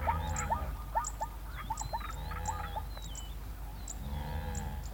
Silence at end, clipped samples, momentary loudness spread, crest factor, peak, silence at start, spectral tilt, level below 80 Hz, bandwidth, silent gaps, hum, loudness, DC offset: 0 s; under 0.1%; 9 LU; 18 dB; -18 dBFS; 0 s; -4 dB/octave; -40 dBFS; 17 kHz; none; none; -39 LUFS; under 0.1%